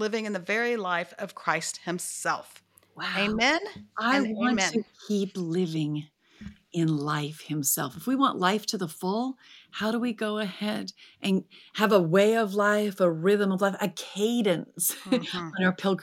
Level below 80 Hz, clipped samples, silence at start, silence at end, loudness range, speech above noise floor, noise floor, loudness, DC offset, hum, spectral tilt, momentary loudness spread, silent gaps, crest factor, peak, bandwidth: -66 dBFS; under 0.1%; 0 s; 0 s; 5 LU; 20 dB; -47 dBFS; -27 LUFS; under 0.1%; none; -4.5 dB/octave; 10 LU; none; 20 dB; -6 dBFS; 17 kHz